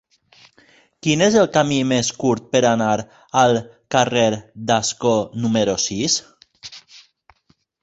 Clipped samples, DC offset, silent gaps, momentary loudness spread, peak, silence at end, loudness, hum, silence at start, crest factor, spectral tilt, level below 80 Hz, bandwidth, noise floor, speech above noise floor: under 0.1%; under 0.1%; none; 9 LU; -2 dBFS; 1.05 s; -19 LUFS; none; 1.05 s; 18 dB; -4 dB/octave; -54 dBFS; 8.2 kHz; -62 dBFS; 44 dB